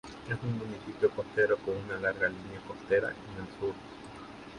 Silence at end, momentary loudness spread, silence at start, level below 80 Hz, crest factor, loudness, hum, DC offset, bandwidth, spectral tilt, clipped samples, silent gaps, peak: 0 s; 16 LU; 0.05 s; -60 dBFS; 18 dB; -32 LUFS; none; under 0.1%; 11 kHz; -6.5 dB/octave; under 0.1%; none; -14 dBFS